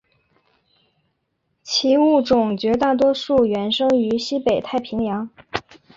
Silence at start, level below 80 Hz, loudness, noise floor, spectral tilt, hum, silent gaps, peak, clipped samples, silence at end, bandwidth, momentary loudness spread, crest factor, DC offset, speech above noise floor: 1.65 s; -52 dBFS; -19 LUFS; -72 dBFS; -5 dB/octave; none; none; -2 dBFS; under 0.1%; 0.35 s; 7.8 kHz; 12 LU; 18 dB; under 0.1%; 54 dB